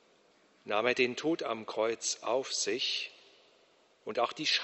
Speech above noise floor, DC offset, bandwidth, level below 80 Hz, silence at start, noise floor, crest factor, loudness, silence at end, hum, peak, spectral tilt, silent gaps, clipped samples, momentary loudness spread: 34 dB; under 0.1%; 8.2 kHz; -80 dBFS; 0.65 s; -66 dBFS; 22 dB; -32 LUFS; 0 s; none; -12 dBFS; -1.5 dB/octave; none; under 0.1%; 9 LU